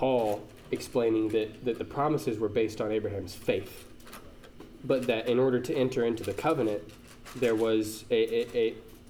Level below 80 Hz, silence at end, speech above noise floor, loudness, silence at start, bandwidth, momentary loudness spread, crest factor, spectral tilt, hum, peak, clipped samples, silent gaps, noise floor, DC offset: -56 dBFS; 0 s; 20 dB; -29 LUFS; 0 s; 18 kHz; 18 LU; 16 dB; -6 dB/octave; none; -14 dBFS; under 0.1%; none; -49 dBFS; under 0.1%